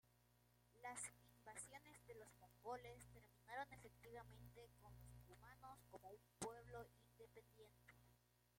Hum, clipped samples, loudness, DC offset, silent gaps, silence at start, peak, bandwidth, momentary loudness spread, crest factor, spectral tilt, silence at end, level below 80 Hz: 60 Hz at -70 dBFS; under 0.1%; -60 LUFS; under 0.1%; none; 0.05 s; -34 dBFS; 16.5 kHz; 13 LU; 26 dB; -3.5 dB/octave; 0 s; -76 dBFS